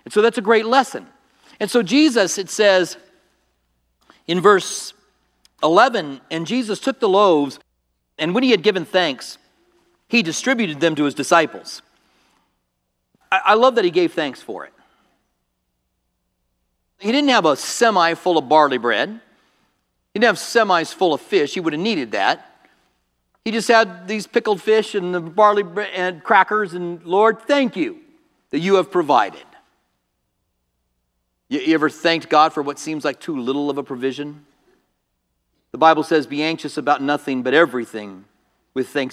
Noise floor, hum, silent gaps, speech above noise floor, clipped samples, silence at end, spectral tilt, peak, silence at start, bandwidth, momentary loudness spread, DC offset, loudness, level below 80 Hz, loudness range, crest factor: -73 dBFS; none; none; 55 dB; under 0.1%; 0 s; -4 dB/octave; 0 dBFS; 0.05 s; 14.5 kHz; 13 LU; under 0.1%; -18 LUFS; -72 dBFS; 5 LU; 20 dB